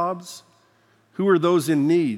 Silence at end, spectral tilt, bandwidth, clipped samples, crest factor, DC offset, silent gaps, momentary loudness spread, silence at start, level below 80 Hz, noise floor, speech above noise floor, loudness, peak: 0 s; -6.5 dB/octave; 15.5 kHz; under 0.1%; 16 dB; under 0.1%; none; 21 LU; 0 s; -82 dBFS; -60 dBFS; 40 dB; -20 LUFS; -6 dBFS